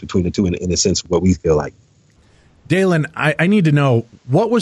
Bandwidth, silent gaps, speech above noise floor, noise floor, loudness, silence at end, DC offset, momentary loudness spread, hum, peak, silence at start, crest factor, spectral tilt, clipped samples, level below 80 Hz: 12 kHz; none; 37 dB; -52 dBFS; -16 LUFS; 0 s; under 0.1%; 6 LU; none; -4 dBFS; 0 s; 12 dB; -5.5 dB/octave; under 0.1%; -40 dBFS